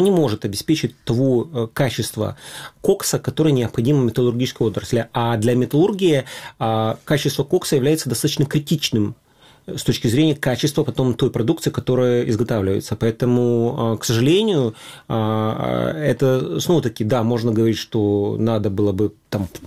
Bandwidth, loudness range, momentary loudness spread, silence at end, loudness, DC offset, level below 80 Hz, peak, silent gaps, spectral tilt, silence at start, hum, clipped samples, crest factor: 16 kHz; 2 LU; 6 LU; 0 s; -19 LUFS; 0.2%; -50 dBFS; -4 dBFS; none; -6 dB/octave; 0 s; none; under 0.1%; 16 dB